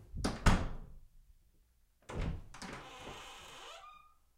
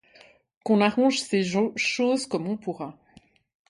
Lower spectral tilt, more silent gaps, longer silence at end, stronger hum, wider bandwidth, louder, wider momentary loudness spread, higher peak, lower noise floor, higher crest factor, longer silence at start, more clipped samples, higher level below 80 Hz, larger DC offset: about the same, -5 dB/octave vs -4.5 dB/octave; neither; second, 0.4 s vs 0.8 s; neither; first, 15.5 kHz vs 11.5 kHz; second, -40 LUFS vs -24 LUFS; first, 21 LU vs 14 LU; second, -14 dBFS vs -6 dBFS; first, -70 dBFS vs -58 dBFS; first, 26 dB vs 20 dB; second, 0 s vs 0.65 s; neither; first, -42 dBFS vs -70 dBFS; neither